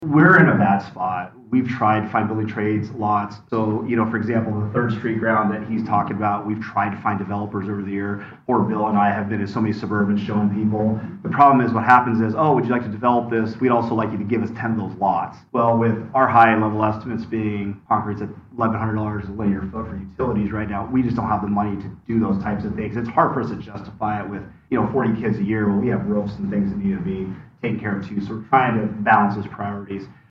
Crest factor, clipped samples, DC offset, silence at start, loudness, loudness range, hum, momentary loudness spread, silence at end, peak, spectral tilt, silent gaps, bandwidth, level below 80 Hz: 20 dB; under 0.1%; under 0.1%; 0 s; -21 LUFS; 6 LU; none; 12 LU; 0.2 s; 0 dBFS; -9.5 dB/octave; none; 6.2 kHz; -52 dBFS